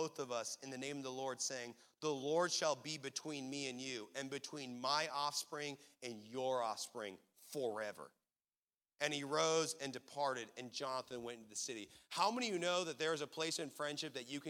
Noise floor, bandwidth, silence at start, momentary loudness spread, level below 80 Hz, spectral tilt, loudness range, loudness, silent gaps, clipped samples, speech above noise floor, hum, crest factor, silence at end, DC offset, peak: under -90 dBFS; 17 kHz; 0 s; 11 LU; -90 dBFS; -2.5 dB/octave; 3 LU; -42 LUFS; 8.58-8.68 s; under 0.1%; over 48 dB; none; 24 dB; 0 s; under 0.1%; -20 dBFS